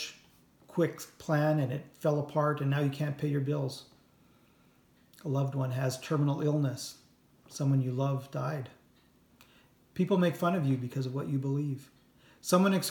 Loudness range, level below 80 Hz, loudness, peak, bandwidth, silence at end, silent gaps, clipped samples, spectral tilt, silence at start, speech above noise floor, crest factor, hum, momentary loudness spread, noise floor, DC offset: 4 LU; -72 dBFS; -31 LUFS; -12 dBFS; 18.5 kHz; 0 s; none; under 0.1%; -6.5 dB/octave; 0 s; 34 dB; 20 dB; none; 13 LU; -64 dBFS; under 0.1%